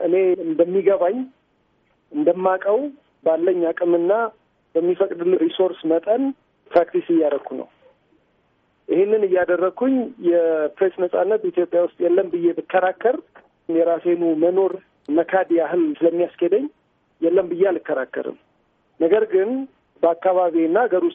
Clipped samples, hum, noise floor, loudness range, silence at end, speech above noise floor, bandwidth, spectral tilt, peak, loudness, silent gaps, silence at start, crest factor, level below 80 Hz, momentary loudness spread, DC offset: under 0.1%; none; -64 dBFS; 2 LU; 0 s; 45 dB; 3.8 kHz; -5 dB/octave; -4 dBFS; -20 LUFS; none; 0 s; 16 dB; -70 dBFS; 8 LU; under 0.1%